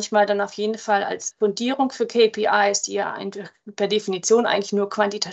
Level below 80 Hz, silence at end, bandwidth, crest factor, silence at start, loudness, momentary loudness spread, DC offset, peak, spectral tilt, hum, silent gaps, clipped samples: -76 dBFS; 0 s; 8.4 kHz; 16 dB; 0 s; -21 LUFS; 9 LU; under 0.1%; -6 dBFS; -3 dB/octave; none; none; under 0.1%